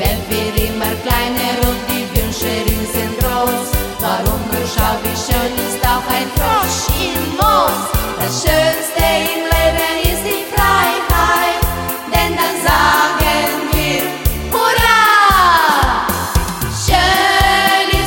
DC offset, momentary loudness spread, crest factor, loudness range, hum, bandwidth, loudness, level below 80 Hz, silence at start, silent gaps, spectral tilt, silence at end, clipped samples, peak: under 0.1%; 7 LU; 14 dB; 5 LU; none; 17 kHz; -14 LUFS; -24 dBFS; 0 s; none; -3.5 dB/octave; 0 s; under 0.1%; 0 dBFS